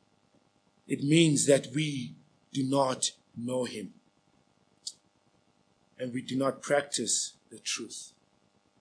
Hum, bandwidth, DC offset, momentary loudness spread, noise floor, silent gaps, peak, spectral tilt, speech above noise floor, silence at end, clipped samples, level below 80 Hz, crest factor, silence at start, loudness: none; 10.5 kHz; under 0.1%; 19 LU; -69 dBFS; none; -10 dBFS; -4 dB/octave; 40 dB; 0.75 s; under 0.1%; -82 dBFS; 22 dB; 0.9 s; -29 LUFS